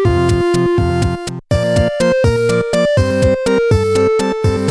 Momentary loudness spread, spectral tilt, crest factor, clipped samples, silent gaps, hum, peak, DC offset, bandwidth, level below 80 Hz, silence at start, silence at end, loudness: 4 LU; -6.5 dB/octave; 12 dB; under 0.1%; none; none; -2 dBFS; under 0.1%; 11 kHz; -28 dBFS; 0 s; 0 s; -14 LUFS